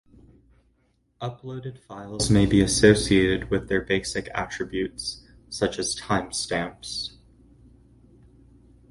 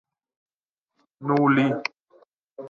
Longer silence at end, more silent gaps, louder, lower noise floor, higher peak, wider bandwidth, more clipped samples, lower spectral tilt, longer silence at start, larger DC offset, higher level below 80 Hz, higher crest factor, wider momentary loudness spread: first, 1.8 s vs 0 s; second, none vs 2.27-2.47 s; about the same, -24 LUFS vs -22 LUFS; second, -67 dBFS vs -89 dBFS; first, -2 dBFS vs -8 dBFS; first, 11.5 kHz vs 7 kHz; neither; second, -4.5 dB/octave vs -7.5 dB/octave; about the same, 1.2 s vs 1.2 s; neither; first, -44 dBFS vs -76 dBFS; about the same, 24 dB vs 20 dB; first, 18 LU vs 14 LU